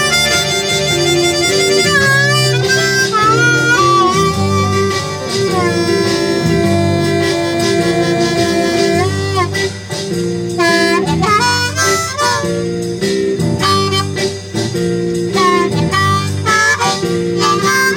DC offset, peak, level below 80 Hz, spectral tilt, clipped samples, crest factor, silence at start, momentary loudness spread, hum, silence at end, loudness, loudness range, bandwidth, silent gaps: under 0.1%; 0 dBFS; -42 dBFS; -4 dB/octave; under 0.1%; 14 dB; 0 s; 7 LU; none; 0 s; -13 LUFS; 4 LU; 19.5 kHz; none